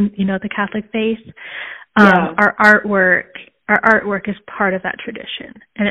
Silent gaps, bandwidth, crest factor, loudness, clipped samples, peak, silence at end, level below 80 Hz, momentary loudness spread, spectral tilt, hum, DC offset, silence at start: none; 9.2 kHz; 16 dB; -15 LUFS; under 0.1%; 0 dBFS; 0 s; -52 dBFS; 18 LU; -6.5 dB/octave; none; under 0.1%; 0 s